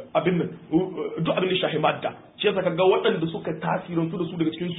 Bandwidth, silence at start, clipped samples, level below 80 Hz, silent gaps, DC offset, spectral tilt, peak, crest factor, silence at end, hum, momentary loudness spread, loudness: 4 kHz; 0 s; under 0.1%; -60 dBFS; none; under 0.1%; -11 dB/octave; -8 dBFS; 16 dB; 0 s; none; 8 LU; -25 LUFS